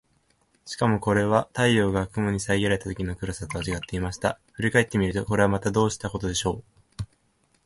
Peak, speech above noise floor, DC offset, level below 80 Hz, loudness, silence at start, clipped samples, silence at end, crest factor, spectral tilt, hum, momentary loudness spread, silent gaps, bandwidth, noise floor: -6 dBFS; 42 dB; under 0.1%; -44 dBFS; -25 LUFS; 0.65 s; under 0.1%; 0.6 s; 20 dB; -5.5 dB/octave; none; 10 LU; none; 11.5 kHz; -67 dBFS